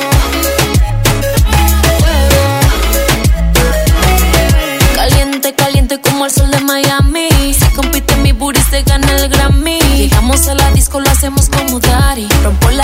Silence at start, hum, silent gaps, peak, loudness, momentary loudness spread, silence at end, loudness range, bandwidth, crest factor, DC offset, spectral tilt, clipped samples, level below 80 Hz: 0 s; none; none; 0 dBFS; -10 LUFS; 3 LU; 0 s; 1 LU; 16.5 kHz; 10 dB; under 0.1%; -4 dB/octave; 0.2%; -12 dBFS